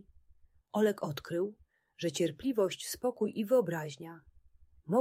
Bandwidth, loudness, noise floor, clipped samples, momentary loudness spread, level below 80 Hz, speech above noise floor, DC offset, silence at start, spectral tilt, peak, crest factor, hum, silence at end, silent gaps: 16 kHz; -33 LUFS; -63 dBFS; under 0.1%; 11 LU; -68 dBFS; 31 dB; under 0.1%; 0.75 s; -5 dB/octave; -16 dBFS; 18 dB; none; 0 s; none